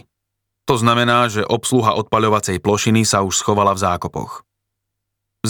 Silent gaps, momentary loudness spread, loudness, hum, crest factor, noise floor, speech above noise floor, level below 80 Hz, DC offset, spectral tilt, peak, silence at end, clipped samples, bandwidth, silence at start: none; 12 LU; -16 LUFS; none; 16 dB; -78 dBFS; 61 dB; -50 dBFS; under 0.1%; -4.5 dB/octave; -2 dBFS; 0 s; under 0.1%; over 20 kHz; 0.65 s